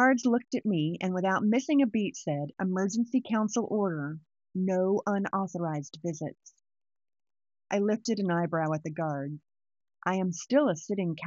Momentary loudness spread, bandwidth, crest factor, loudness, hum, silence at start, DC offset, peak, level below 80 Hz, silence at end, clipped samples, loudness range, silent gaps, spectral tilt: 10 LU; 7.8 kHz; 18 dB; -30 LUFS; none; 0 s; under 0.1%; -12 dBFS; -76 dBFS; 0 s; under 0.1%; 5 LU; none; -6 dB/octave